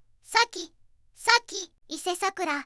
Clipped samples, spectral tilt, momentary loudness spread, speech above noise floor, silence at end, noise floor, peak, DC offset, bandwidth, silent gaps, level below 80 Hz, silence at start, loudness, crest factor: under 0.1%; 0.5 dB/octave; 15 LU; 31 dB; 0 s; -59 dBFS; -4 dBFS; under 0.1%; 12 kHz; none; -66 dBFS; 0.3 s; -26 LUFS; 24 dB